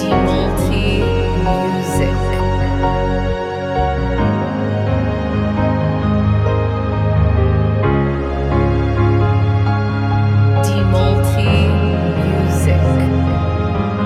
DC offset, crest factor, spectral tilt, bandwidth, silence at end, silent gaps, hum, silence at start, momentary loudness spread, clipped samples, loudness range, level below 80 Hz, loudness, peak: under 0.1%; 12 dB; -7.5 dB/octave; 13.5 kHz; 0 s; none; none; 0 s; 4 LU; under 0.1%; 3 LU; -24 dBFS; -16 LUFS; -2 dBFS